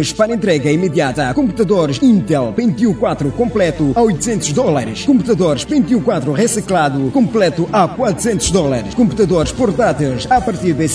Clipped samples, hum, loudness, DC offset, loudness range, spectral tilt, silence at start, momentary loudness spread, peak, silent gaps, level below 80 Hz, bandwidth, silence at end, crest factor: under 0.1%; none; -14 LUFS; under 0.1%; 1 LU; -5.5 dB/octave; 0 s; 3 LU; 0 dBFS; none; -36 dBFS; 11 kHz; 0 s; 14 dB